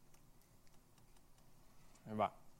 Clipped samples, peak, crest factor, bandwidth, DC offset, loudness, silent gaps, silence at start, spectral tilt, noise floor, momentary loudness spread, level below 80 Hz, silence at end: under 0.1%; -24 dBFS; 26 dB; 16 kHz; under 0.1%; -43 LUFS; none; 0 s; -6.5 dB/octave; -65 dBFS; 28 LU; -70 dBFS; 0.05 s